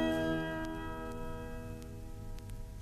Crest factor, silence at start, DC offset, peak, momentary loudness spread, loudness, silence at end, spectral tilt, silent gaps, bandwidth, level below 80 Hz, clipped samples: 18 dB; 0 s; under 0.1%; -20 dBFS; 14 LU; -40 LUFS; 0 s; -6 dB/octave; none; 14 kHz; -46 dBFS; under 0.1%